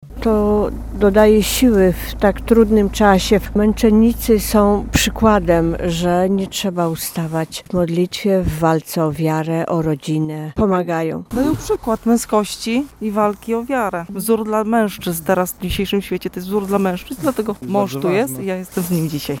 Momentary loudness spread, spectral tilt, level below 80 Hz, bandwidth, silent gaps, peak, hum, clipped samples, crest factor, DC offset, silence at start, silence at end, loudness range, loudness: 9 LU; -5.5 dB/octave; -32 dBFS; 17.5 kHz; none; 0 dBFS; none; under 0.1%; 16 dB; under 0.1%; 0 s; 0 s; 5 LU; -17 LUFS